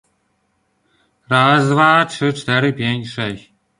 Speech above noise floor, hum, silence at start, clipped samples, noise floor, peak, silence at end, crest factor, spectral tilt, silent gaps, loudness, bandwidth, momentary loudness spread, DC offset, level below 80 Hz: 50 dB; none; 1.3 s; under 0.1%; -65 dBFS; -2 dBFS; 0.4 s; 16 dB; -5.5 dB/octave; none; -16 LUFS; 11 kHz; 12 LU; under 0.1%; -56 dBFS